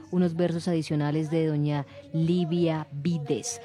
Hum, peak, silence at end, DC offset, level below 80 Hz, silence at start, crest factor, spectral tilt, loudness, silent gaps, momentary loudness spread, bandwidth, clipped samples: none; -12 dBFS; 0 s; under 0.1%; -68 dBFS; 0 s; 14 dB; -6.5 dB/octave; -27 LUFS; none; 5 LU; 11 kHz; under 0.1%